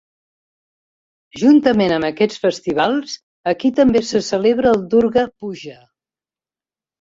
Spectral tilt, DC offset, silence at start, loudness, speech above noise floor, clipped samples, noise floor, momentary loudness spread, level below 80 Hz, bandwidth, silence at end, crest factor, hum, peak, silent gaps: -5.5 dB/octave; under 0.1%; 1.35 s; -16 LUFS; over 74 dB; under 0.1%; under -90 dBFS; 15 LU; -52 dBFS; 7.8 kHz; 1.3 s; 16 dB; none; -2 dBFS; 3.23-3.44 s